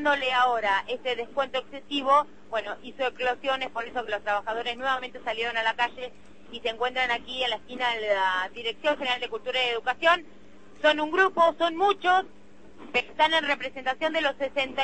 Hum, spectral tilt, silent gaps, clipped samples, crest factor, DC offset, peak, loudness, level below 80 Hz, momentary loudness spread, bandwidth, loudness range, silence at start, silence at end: none; -2.5 dB/octave; none; under 0.1%; 20 dB; 0.5%; -8 dBFS; -26 LUFS; -62 dBFS; 9 LU; 8.8 kHz; 5 LU; 0 s; 0 s